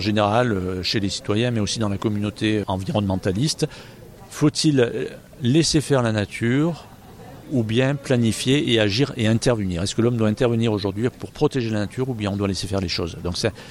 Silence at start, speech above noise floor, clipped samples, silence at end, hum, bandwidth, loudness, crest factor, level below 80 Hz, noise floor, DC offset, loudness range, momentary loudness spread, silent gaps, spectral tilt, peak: 0 s; 20 dB; under 0.1%; 0 s; none; 15.5 kHz; -22 LUFS; 16 dB; -46 dBFS; -41 dBFS; under 0.1%; 3 LU; 8 LU; none; -5.5 dB/octave; -4 dBFS